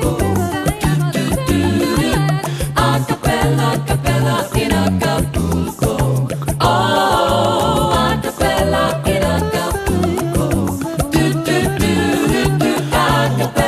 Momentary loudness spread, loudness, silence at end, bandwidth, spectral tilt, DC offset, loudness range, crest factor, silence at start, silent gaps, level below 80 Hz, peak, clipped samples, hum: 4 LU; -16 LUFS; 0 s; 15.5 kHz; -5.5 dB/octave; under 0.1%; 2 LU; 14 dB; 0 s; none; -28 dBFS; 0 dBFS; under 0.1%; none